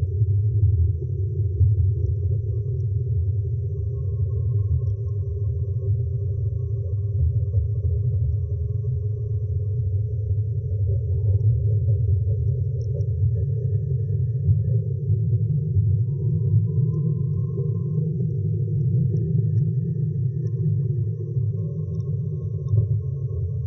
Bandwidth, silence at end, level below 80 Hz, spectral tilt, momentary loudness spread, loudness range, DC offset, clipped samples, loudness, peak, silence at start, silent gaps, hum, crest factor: 1.1 kHz; 0 s; -38 dBFS; -16.5 dB/octave; 5 LU; 2 LU; under 0.1%; under 0.1%; -24 LUFS; -8 dBFS; 0 s; none; none; 14 dB